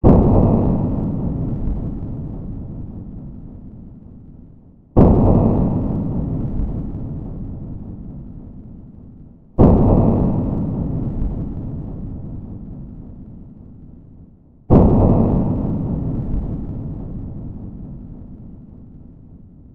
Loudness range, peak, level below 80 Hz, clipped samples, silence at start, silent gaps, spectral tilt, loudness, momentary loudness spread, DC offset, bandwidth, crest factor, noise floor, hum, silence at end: 12 LU; 0 dBFS; -26 dBFS; under 0.1%; 0.05 s; none; -13 dB/octave; -19 LUFS; 25 LU; under 0.1%; 3.1 kHz; 18 dB; -45 dBFS; none; 0.05 s